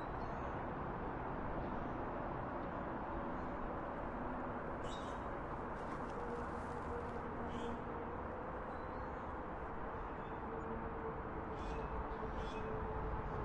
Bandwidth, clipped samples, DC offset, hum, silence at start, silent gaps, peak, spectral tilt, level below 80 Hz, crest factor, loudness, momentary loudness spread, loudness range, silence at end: 11 kHz; under 0.1%; under 0.1%; none; 0 s; none; -30 dBFS; -7.5 dB/octave; -52 dBFS; 14 dB; -44 LUFS; 2 LU; 2 LU; 0 s